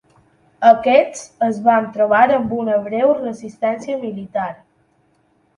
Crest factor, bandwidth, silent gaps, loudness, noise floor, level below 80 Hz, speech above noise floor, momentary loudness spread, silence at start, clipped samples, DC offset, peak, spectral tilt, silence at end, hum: 18 dB; 10.5 kHz; none; -17 LUFS; -60 dBFS; -60 dBFS; 44 dB; 12 LU; 0.6 s; under 0.1%; under 0.1%; 0 dBFS; -5.5 dB/octave; 1.05 s; none